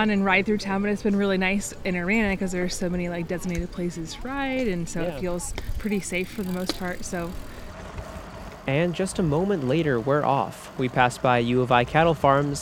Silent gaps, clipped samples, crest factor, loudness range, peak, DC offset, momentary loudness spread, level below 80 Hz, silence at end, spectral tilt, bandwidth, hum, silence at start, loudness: none; under 0.1%; 22 dB; 7 LU; -2 dBFS; under 0.1%; 13 LU; -40 dBFS; 0 s; -5.5 dB/octave; 17.5 kHz; none; 0 s; -25 LUFS